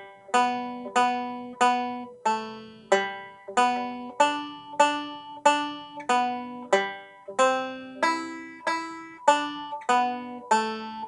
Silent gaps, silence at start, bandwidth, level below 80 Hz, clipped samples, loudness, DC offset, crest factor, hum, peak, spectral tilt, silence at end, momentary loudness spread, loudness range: none; 0 s; 11.5 kHz; -74 dBFS; under 0.1%; -26 LUFS; under 0.1%; 22 dB; none; -4 dBFS; -2.5 dB/octave; 0 s; 12 LU; 2 LU